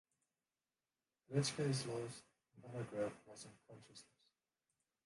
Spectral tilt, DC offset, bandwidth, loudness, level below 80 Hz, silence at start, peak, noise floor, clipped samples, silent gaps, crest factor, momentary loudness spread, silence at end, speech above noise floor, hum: -5 dB/octave; under 0.1%; 11.5 kHz; -43 LUFS; -80 dBFS; 1.3 s; -24 dBFS; under -90 dBFS; under 0.1%; none; 24 dB; 22 LU; 1 s; over 46 dB; none